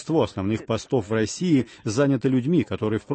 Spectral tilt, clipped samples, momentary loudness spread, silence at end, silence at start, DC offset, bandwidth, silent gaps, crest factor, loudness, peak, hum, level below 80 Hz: -6.5 dB/octave; under 0.1%; 5 LU; 0 s; 0 s; under 0.1%; 8.8 kHz; none; 16 dB; -24 LUFS; -8 dBFS; none; -56 dBFS